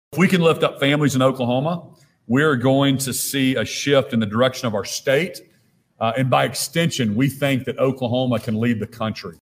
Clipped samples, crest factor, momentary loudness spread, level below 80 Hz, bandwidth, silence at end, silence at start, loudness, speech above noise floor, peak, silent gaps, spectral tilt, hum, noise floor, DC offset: under 0.1%; 16 dB; 8 LU; -58 dBFS; 16 kHz; 0.15 s; 0.1 s; -20 LUFS; 41 dB; -4 dBFS; none; -5 dB/octave; none; -60 dBFS; under 0.1%